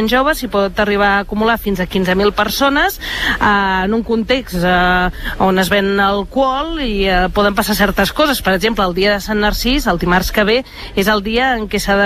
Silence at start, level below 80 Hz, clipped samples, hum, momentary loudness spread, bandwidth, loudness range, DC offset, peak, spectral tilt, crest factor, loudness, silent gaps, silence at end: 0 s; -28 dBFS; under 0.1%; none; 4 LU; 15 kHz; 1 LU; under 0.1%; -2 dBFS; -4.5 dB/octave; 14 dB; -14 LUFS; none; 0 s